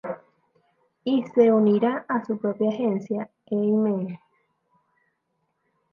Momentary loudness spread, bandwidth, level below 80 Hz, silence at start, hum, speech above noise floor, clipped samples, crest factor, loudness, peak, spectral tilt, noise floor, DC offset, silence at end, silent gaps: 15 LU; 6.2 kHz; -76 dBFS; 0.05 s; none; 52 dB; under 0.1%; 18 dB; -24 LUFS; -6 dBFS; -9 dB/octave; -75 dBFS; under 0.1%; 1.75 s; none